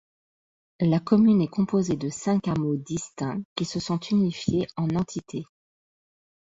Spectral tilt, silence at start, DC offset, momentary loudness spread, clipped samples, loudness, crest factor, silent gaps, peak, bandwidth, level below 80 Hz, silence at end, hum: -6.5 dB/octave; 0.8 s; under 0.1%; 11 LU; under 0.1%; -25 LUFS; 18 dB; 3.45-3.56 s; -6 dBFS; 8 kHz; -56 dBFS; 1.05 s; none